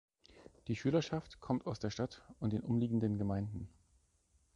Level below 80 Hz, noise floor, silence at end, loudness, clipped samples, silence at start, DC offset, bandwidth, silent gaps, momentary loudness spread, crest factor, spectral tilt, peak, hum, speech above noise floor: -60 dBFS; -74 dBFS; 0.9 s; -38 LUFS; under 0.1%; 0.35 s; under 0.1%; 9.6 kHz; none; 10 LU; 18 dB; -7.5 dB/octave; -22 dBFS; none; 37 dB